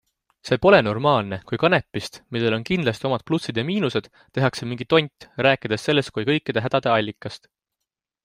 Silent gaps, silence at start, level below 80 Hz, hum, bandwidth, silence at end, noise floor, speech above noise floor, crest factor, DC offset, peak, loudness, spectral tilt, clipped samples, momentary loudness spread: none; 0.45 s; -54 dBFS; none; 15.5 kHz; 0.9 s; -84 dBFS; 62 dB; 20 dB; under 0.1%; -2 dBFS; -22 LUFS; -6 dB/octave; under 0.1%; 13 LU